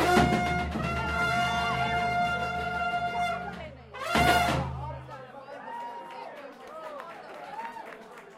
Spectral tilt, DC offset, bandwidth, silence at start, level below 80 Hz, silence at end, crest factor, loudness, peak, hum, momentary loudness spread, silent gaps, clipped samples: -5 dB/octave; under 0.1%; 16 kHz; 0 s; -44 dBFS; 0 s; 20 dB; -28 LUFS; -10 dBFS; none; 20 LU; none; under 0.1%